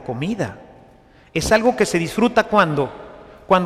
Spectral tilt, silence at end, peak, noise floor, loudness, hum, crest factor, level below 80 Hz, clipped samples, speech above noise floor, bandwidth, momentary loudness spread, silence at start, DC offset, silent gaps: -5 dB/octave; 0 s; -2 dBFS; -49 dBFS; -19 LUFS; none; 18 dB; -44 dBFS; under 0.1%; 31 dB; 15.5 kHz; 11 LU; 0 s; under 0.1%; none